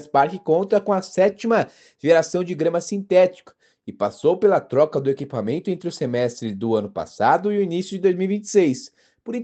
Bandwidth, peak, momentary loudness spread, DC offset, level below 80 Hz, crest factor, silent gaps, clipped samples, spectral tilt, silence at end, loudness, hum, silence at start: 8.8 kHz; -4 dBFS; 9 LU; under 0.1%; -68 dBFS; 18 dB; none; under 0.1%; -6 dB/octave; 0 s; -21 LUFS; none; 0 s